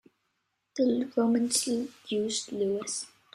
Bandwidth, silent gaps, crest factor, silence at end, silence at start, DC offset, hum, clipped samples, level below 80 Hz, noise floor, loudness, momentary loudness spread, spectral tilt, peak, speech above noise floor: 13.5 kHz; none; 18 dB; 0.25 s; 0.75 s; under 0.1%; none; under 0.1%; -74 dBFS; -79 dBFS; -29 LUFS; 8 LU; -3.5 dB/octave; -12 dBFS; 50 dB